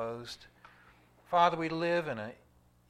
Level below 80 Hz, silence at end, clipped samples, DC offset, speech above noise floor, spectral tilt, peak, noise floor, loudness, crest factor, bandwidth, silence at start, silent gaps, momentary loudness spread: -68 dBFS; 0.55 s; under 0.1%; under 0.1%; 30 dB; -5.5 dB/octave; -12 dBFS; -62 dBFS; -31 LUFS; 22 dB; 13.5 kHz; 0 s; none; 18 LU